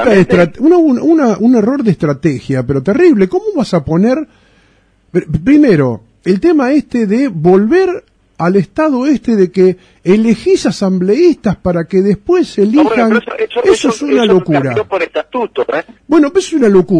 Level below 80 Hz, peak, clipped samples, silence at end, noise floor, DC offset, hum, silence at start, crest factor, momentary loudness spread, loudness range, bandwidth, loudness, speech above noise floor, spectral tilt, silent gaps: -42 dBFS; 0 dBFS; under 0.1%; 0 s; -51 dBFS; under 0.1%; none; 0 s; 10 dB; 8 LU; 2 LU; 10 kHz; -11 LUFS; 40 dB; -7 dB/octave; none